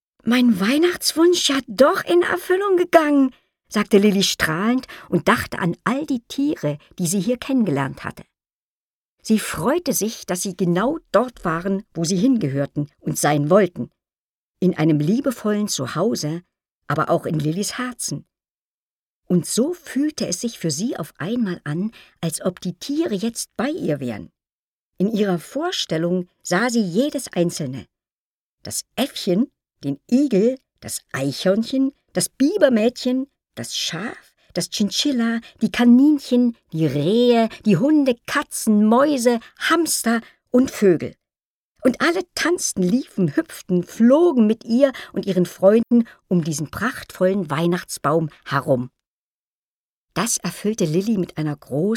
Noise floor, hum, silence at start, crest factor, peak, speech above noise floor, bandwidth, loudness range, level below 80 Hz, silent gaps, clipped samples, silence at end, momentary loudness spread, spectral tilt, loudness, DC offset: under -90 dBFS; none; 0.25 s; 20 dB; 0 dBFS; over 70 dB; 17.5 kHz; 7 LU; -56 dBFS; 8.53-9.18 s, 14.18-14.54 s, 16.71-16.82 s, 18.51-19.22 s, 24.52-24.93 s, 28.12-28.58 s, 41.45-41.75 s, 49.07-50.08 s; under 0.1%; 0 s; 11 LU; -5 dB/octave; -20 LUFS; under 0.1%